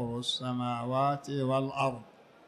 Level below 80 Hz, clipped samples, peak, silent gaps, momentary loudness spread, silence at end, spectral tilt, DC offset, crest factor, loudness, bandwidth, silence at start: -66 dBFS; under 0.1%; -16 dBFS; none; 4 LU; 0.35 s; -5.5 dB/octave; under 0.1%; 16 dB; -31 LUFS; 12.5 kHz; 0 s